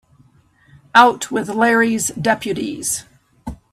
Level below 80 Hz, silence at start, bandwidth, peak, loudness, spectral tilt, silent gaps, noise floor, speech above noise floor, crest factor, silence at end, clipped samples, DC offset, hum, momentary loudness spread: -48 dBFS; 0.95 s; 16 kHz; 0 dBFS; -16 LUFS; -3 dB/octave; none; -54 dBFS; 37 dB; 18 dB; 0.2 s; under 0.1%; under 0.1%; none; 17 LU